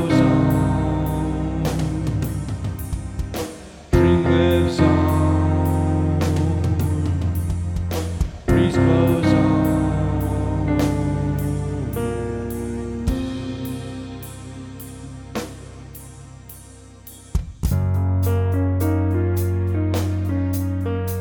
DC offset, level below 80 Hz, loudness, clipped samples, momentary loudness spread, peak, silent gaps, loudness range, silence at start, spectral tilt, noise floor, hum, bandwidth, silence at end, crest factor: under 0.1%; -32 dBFS; -21 LUFS; under 0.1%; 18 LU; -2 dBFS; none; 11 LU; 0 s; -7.5 dB/octave; -42 dBFS; none; over 20 kHz; 0 s; 18 dB